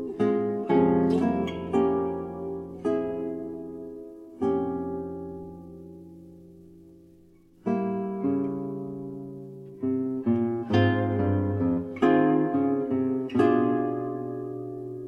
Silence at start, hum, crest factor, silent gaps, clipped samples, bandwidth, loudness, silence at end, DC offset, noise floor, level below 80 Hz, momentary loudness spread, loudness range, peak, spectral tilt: 0 s; none; 18 dB; none; under 0.1%; 7 kHz; -27 LUFS; 0 s; under 0.1%; -56 dBFS; -60 dBFS; 18 LU; 10 LU; -10 dBFS; -9 dB/octave